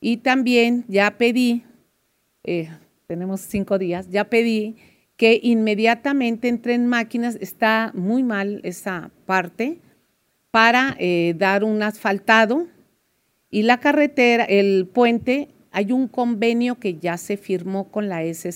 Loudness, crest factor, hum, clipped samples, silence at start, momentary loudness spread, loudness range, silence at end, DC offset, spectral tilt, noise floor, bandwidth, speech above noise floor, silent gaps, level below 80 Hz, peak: -20 LUFS; 20 dB; none; under 0.1%; 0 s; 11 LU; 5 LU; 0 s; under 0.1%; -5.5 dB/octave; -68 dBFS; 16 kHz; 48 dB; none; -62 dBFS; 0 dBFS